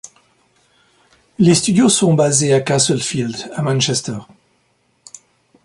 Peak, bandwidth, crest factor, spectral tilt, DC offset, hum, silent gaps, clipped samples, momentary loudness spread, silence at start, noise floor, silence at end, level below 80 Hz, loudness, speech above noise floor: 0 dBFS; 11.5 kHz; 18 dB; -4.5 dB/octave; under 0.1%; none; none; under 0.1%; 10 LU; 1.4 s; -62 dBFS; 1.4 s; -54 dBFS; -15 LUFS; 47 dB